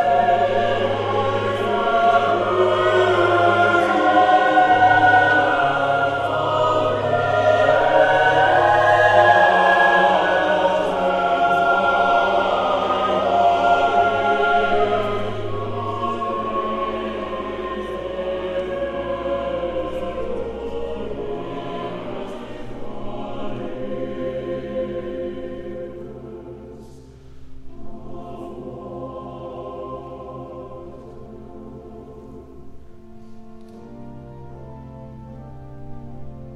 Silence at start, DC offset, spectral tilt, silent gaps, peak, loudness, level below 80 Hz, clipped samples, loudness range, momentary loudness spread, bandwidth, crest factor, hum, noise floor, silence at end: 0 s; under 0.1%; -5.5 dB/octave; none; -2 dBFS; -18 LUFS; -44 dBFS; under 0.1%; 21 LU; 24 LU; 10 kHz; 18 dB; none; -41 dBFS; 0 s